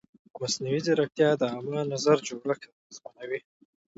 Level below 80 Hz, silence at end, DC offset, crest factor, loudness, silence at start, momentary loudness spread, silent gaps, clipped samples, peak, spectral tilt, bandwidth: -74 dBFS; 0.6 s; under 0.1%; 20 dB; -28 LUFS; 0.35 s; 17 LU; 2.72-2.90 s; under 0.1%; -10 dBFS; -4.5 dB/octave; 8 kHz